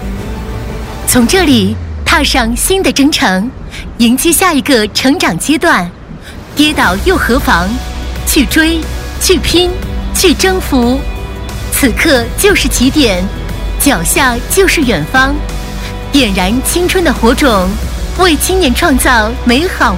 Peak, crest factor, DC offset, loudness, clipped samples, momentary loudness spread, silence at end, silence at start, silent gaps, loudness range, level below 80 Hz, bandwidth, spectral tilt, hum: 0 dBFS; 10 dB; under 0.1%; -10 LUFS; 0.5%; 13 LU; 0 s; 0 s; none; 2 LU; -20 dBFS; 16.5 kHz; -3.5 dB/octave; none